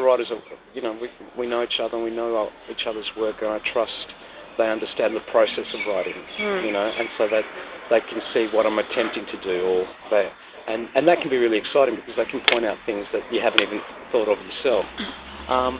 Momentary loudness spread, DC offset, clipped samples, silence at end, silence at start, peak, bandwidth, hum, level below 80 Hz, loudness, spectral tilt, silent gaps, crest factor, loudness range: 12 LU; under 0.1%; under 0.1%; 0 s; 0 s; 0 dBFS; 4 kHz; none; -56 dBFS; -23 LUFS; -8 dB/octave; none; 24 dB; 4 LU